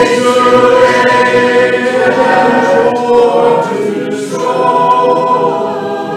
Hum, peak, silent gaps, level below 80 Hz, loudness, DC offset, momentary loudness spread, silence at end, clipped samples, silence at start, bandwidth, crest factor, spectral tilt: none; 0 dBFS; none; -50 dBFS; -9 LUFS; under 0.1%; 8 LU; 0 s; under 0.1%; 0 s; 12.5 kHz; 10 dB; -4.5 dB/octave